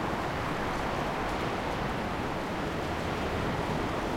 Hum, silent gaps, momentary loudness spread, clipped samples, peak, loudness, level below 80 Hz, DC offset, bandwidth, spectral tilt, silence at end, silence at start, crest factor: none; none; 2 LU; under 0.1%; -18 dBFS; -32 LUFS; -44 dBFS; under 0.1%; 16.5 kHz; -5.5 dB/octave; 0 s; 0 s; 12 dB